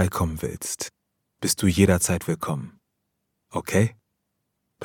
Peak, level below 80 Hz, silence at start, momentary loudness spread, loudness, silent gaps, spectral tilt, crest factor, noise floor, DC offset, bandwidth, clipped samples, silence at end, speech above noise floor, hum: -4 dBFS; -46 dBFS; 0 s; 14 LU; -24 LUFS; none; -5 dB/octave; 22 dB; -77 dBFS; under 0.1%; 18.5 kHz; under 0.1%; 0 s; 54 dB; none